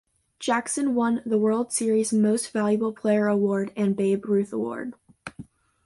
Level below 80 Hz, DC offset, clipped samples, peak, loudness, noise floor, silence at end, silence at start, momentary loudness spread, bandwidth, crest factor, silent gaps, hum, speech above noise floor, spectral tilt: -66 dBFS; under 0.1%; under 0.1%; -10 dBFS; -24 LUFS; -46 dBFS; 0.45 s; 0.4 s; 13 LU; 12 kHz; 14 dB; none; none; 23 dB; -5.5 dB/octave